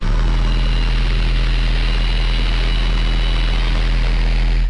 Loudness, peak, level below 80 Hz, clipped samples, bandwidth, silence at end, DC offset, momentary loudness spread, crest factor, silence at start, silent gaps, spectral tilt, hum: -19 LUFS; -6 dBFS; -16 dBFS; under 0.1%; 7.2 kHz; 0 s; 0.9%; 0 LU; 8 dB; 0 s; none; -5.5 dB/octave; none